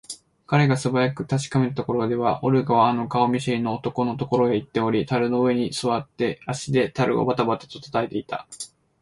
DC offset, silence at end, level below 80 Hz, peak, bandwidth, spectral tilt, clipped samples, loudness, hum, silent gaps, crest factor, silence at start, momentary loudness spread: under 0.1%; 0.35 s; -58 dBFS; -6 dBFS; 11.5 kHz; -6.5 dB/octave; under 0.1%; -23 LUFS; none; none; 18 dB; 0.1 s; 10 LU